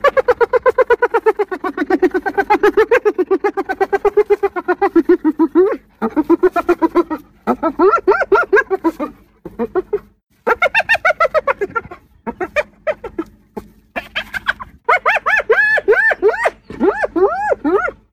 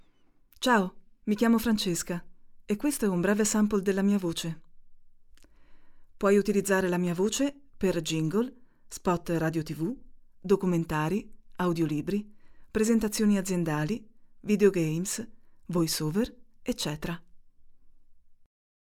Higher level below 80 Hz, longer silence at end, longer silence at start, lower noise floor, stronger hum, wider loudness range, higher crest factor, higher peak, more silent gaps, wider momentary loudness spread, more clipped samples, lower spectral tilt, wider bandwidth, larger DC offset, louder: first, -46 dBFS vs -52 dBFS; second, 0.2 s vs 0.6 s; second, 0.05 s vs 0.6 s; second, -37 dBFS vs -61 dBFS; neither; about the same, 4 LU vs 3 LU; second, 12 dB vs 20 dB; first, -4 dBFS vs -10 dBFS; first, 10.23-10.27 s vs none; about the same, 12 LU vs 11 LU; neither; about the same, -5 dB/octave vs -5 dB/octave; second, 15 kHz vs 18 kHz; neither; first, -15 LUFS vs -28 LUFS